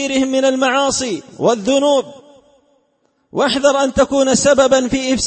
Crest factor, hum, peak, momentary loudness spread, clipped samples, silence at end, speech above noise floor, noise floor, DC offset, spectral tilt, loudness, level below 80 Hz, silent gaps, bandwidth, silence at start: 14 dB; none; 0 dBFS; 7 LU; under 0.1%; 0 s; 48 dB; -62 dBFS; under 0.1%; -3 dB/octave; -15 LUFS; -44 dBFS; none; 8.8 kHz; 0 s